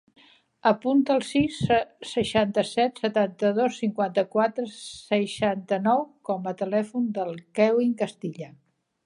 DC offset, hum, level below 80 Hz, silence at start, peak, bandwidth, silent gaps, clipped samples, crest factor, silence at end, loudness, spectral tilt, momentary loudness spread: under 0.1%; none; -60 dBFS; 0.65 s; -6 dBFS; 11.5 kHz; none; under 0.1%; 20 dB; 0.6 s; -25 LUFS; -5.5 dB/octave; 9 LU